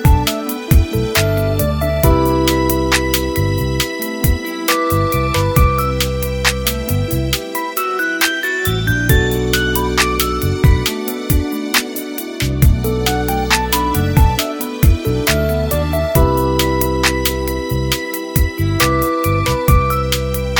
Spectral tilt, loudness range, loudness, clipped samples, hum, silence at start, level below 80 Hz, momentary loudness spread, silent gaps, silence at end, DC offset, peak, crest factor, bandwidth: -5 dB/octave; 1 LU; -16 LUFS; under 0.1%; none; 0 s; -22 dBFS; 5 LU; none; 0 s; under 0.1%; 0 dBFS; 16 dB; 18 kHz